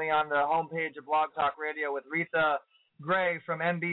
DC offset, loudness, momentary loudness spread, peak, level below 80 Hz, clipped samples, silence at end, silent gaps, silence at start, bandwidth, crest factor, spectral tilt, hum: under 0.1%; -30 LUFS; 6 LU; -16 dBFS; -70 dBFS; under 0.1%; 0 s; none; 0 s; 4.1 kHz; 12 dB; -8.5 dB/octave; none